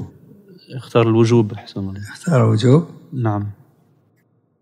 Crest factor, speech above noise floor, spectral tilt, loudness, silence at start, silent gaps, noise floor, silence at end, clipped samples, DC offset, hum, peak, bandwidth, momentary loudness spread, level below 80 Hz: 18 dB; 44 dB; -7.5 dB/octave; -17 LUFS; 0 s; none; -61 dBFS; 1.1 s; under 0.1%; under 0.1%; none; -2 dBFS; 10.5 kHz; 17 LU; -64 dBFS